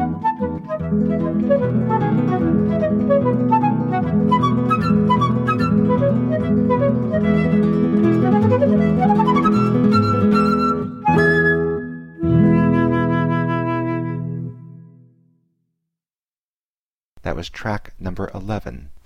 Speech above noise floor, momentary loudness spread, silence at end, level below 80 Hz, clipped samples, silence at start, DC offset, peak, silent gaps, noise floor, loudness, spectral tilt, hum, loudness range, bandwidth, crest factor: over 72 dB; 12 LU; 0.1 s; -40 dBFS; under 0.1%; 0 s; under 0.1%; -4 dBFS; 16.19-16.23 s, 16.38-17.16 s; under -90 dBFS; -18 LUFS; -9 dB/octave; none; 15 LU; 7.2 kHz; 14 dB